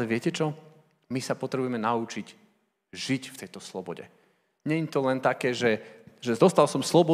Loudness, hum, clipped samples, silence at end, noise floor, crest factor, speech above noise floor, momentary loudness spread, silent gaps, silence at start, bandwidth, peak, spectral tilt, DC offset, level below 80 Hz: -27 LUFS; none; under 0.1%; 0 s; -67 dBFS; 22 dB; 41 dB; 18 LU; none; 0 s; 15.5 kHz; -6 dBFS; -5.5 dB/octave; under 0.1%; -78 dBFS